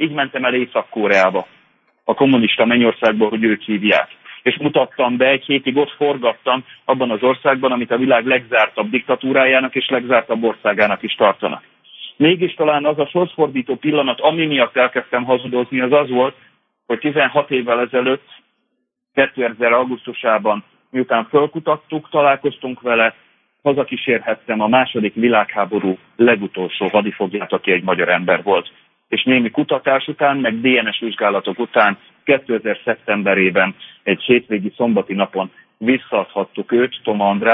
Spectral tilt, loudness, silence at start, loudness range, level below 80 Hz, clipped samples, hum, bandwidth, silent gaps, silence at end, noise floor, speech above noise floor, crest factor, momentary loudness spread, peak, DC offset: -7 dB/octave; -17 LUFS; 0 s; 3 LU; -66 dBFS; under 0.1%; none; 6.6 kHz; none; 0 s; -72 dBFS; 56 dB; 14 dB; 7 LU; -2 dBFS; under 0.1%